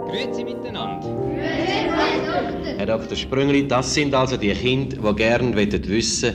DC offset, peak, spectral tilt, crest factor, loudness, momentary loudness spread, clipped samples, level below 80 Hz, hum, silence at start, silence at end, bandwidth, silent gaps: under 0.1%; -6 dBFS; -4.5 dB/octave; 14 dB; -21 LUFS; 8 LU; under 0.1%; -40 dBFS; none; 0 s; 0 s; 11.5 kHz; none